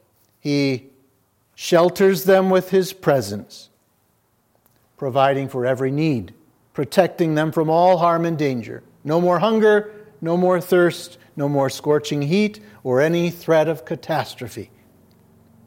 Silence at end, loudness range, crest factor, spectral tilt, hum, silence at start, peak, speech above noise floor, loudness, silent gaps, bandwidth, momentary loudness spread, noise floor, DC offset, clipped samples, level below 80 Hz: 1 s; 4 LU; 20 dB; -6 dB/octave; none; 0.45 s; 0 dBFS; 45 dB; -19 LUFS; none; 17 kHz; 15 LU; -64 dBFS; under 0.1%; under 0.1%; -66 dBFS